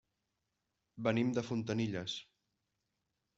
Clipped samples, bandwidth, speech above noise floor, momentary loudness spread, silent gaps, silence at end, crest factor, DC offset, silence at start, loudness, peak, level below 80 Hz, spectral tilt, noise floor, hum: under 0.1%; 7.8 kHz; 50 dB; 8 LU; none; 1.15 s; 22 dB; under 0.1%; 0.95 s; -37 LUFS; -18 dBFS; -72 dBFS; -6 dB/octave; -86 dBFS; none